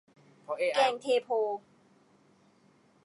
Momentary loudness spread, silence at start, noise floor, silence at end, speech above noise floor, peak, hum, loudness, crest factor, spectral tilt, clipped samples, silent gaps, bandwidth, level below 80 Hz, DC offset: 12 LU; 0.5 s; -65 dBFS; 1.45 s; 36 dB; -12 dBFS; none; -30 LUFS; 20 dB; -2.5 dB/octave; under 0.1%; none; 11.5 kHz; under -90 dBFS; under 0.1%